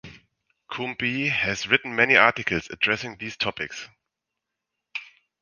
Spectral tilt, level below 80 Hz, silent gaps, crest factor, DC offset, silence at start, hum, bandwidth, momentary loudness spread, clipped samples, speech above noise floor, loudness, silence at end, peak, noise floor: -3.5 dB/octave; -58 dBFS; none; 26 dB; under 0.1%; 0.05 s; none; 10 kHz; 19 LU; under 0.1%; 60 dB; -22 LUFS; 0.35 s; 0 dBFS; -84 dBFS